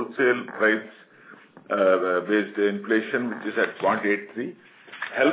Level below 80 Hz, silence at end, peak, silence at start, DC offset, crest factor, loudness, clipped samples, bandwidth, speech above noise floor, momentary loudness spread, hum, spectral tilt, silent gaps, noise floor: -84 dBFS; 0 s; -8 dBFS; 0 s; under 0.1%; 18 dB; -24 LUFS; under 0.1%; 4 kHz; 26 dB; 13 LU; none; -9 dB/octave; none; -50 dBFS